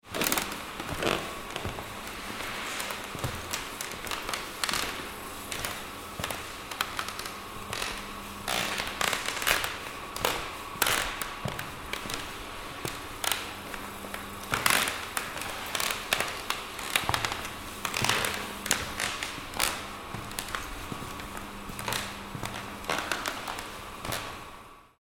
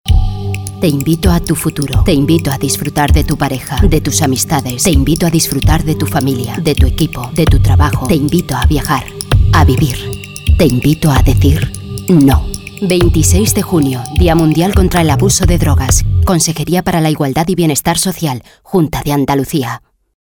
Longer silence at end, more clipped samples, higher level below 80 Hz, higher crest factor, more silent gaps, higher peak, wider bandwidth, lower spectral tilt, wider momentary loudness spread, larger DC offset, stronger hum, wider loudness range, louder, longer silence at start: second, 0.15 s vs 0.55 s; neither; second, -50 dBFS vs -18 dBFS; first, 30 dB vs 12 dB; neither; about the same, -2 dBFS vs 0 dBFS; second, 18 kHz vs over 20 kHz; second, -2 dB/octave vs -5.5 dB/octave; first, 11 LU vs 7 LU; second, under 0.1% vs 0.1%; neither; first, 5 LU vs 2 LU; second, -32 LUFS vs -12 LUFS; about the same, 0.05 s vs 0.05 s